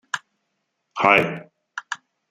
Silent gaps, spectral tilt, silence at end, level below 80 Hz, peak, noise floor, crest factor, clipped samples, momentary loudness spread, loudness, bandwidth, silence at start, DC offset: none; -4.5 dB/octave; 0.35 s; -62 dBFS; -2 dBFS; -76 dBFS; 24 dB; under 0.1%; 21 LU; -20 LUFS; 15 kHz; 0.15 s; under 0.1%